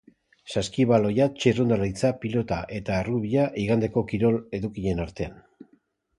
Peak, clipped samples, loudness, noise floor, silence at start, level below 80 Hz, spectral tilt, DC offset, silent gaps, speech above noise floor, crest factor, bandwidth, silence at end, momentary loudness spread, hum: -6 dBFS; under 0.1%; -25 LUFS; -65 dBFS; 0.45 s; -48 dBFS; -7 dB/octave; under 0.1%; none; 40 dB; 20 dB; 11.5 kHz; 0.8 s; 9 LU; none